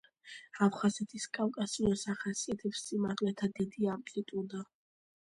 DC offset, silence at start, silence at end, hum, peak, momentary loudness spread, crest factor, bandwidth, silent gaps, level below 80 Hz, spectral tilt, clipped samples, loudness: under 0.1%; 0.25 s; 0.75 s; none; -16 dBFS; 12 LU; 20 dB; 11.5 kHz; none; -64 dBFS; -5 dB/octave; under 0.1%; -35 LUFS